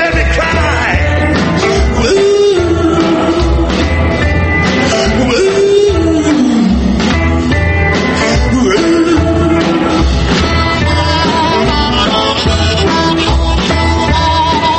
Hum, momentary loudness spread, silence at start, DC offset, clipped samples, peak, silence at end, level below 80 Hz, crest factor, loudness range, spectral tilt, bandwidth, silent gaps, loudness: none; 2 LU; 0 s; under 0.1%; under 0.1%; 0 dBFS; 0 s; -18 dBFS; 10 dB; 0 LU; -5.5 dB/octave; 8.8 kHz; none; -10 LUFS